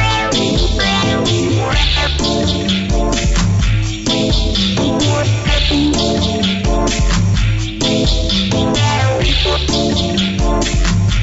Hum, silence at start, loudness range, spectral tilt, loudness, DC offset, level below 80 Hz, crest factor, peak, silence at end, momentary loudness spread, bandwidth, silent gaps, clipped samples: none; 0 s; 1 LU; -4.5 dB/octave; -14 LUFS; under 0.1%; -20 dBFS; 12 dB; -2 dBFS; 0 s; 2 LU; 8 kHz; none; under 0.1%